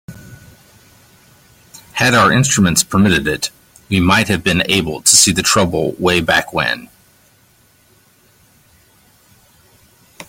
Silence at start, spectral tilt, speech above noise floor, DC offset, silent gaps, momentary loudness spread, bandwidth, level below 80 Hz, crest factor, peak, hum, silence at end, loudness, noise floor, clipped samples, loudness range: 0.1 s; -3 dB/octave; 39 dB; under 0.1%; none; 10 LU; 17 kHz; -44 dBFS; 18 dB; 0 dBFS; none; 0.05 s; -13 LUFS; -52 dBFS; under 0.1%; 8 LU